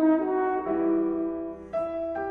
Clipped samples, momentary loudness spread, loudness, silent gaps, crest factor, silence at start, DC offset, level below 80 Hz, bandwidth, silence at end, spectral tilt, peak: under 0.1%; 8 LU; -27 LUFS; none; 14 dB; 0 s; under 0.1%; -58 dBFS; 3.6 kHz; 0 s; -9.5 dB/octave; -12 dBFS